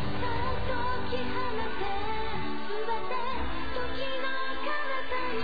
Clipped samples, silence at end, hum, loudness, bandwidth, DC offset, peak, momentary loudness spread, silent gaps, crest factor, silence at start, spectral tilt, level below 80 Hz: under 0.1%; 0 s; none; -33 LUFS; 5 kHz; 4%; -16 dBFS; 3 LU; none; 14 dB; 0 s; -7 dB/octave; -44 dBFS